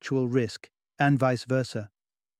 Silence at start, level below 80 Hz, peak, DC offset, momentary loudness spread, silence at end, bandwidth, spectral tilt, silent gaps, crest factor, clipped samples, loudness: 0.05 s; -66 dBFS; -10 dBFS; under 0.1%; 16 LU; 0.55 s; 12 kHz; -7 dB/octave; none; 18 dB; under 0.1%; -27 LUFS